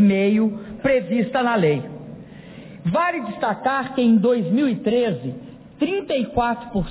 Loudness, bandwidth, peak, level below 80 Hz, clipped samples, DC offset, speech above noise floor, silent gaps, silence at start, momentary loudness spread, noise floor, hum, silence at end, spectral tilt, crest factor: -21 LUFS; 4 kHz; -8 dBFS; -48 dBFS; under 0.1%; under 0.1%; 20 dB; none; 0 s; 19 LU; -40 dBFS; none; 0 s; -11 dB/octave; 12 dB